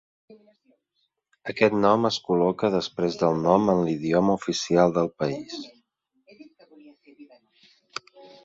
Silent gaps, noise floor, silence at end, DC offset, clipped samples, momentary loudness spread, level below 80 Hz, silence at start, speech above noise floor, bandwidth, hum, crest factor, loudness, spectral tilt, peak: none; -75 dBFS; 0.2 s; under 0.1%; under 0.1%; 18 LU; -60 dBFS; 0.3 s; 53 dB; 8 kHz; none; 22 dB; -23 LUFS; -6 dB/octave; -4 dBFS